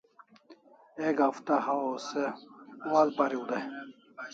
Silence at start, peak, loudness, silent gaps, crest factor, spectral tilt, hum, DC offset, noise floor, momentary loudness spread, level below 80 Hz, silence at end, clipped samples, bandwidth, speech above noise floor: 0.5 s; -10 dBFS; -30 LUFS; none; 20 dB; -5 dB/octave; none; under 0.1%; -58 dBFS; 20 LU; -84 dBFS; 0 s; under 0.1%; 7.8 kHz; 28 dB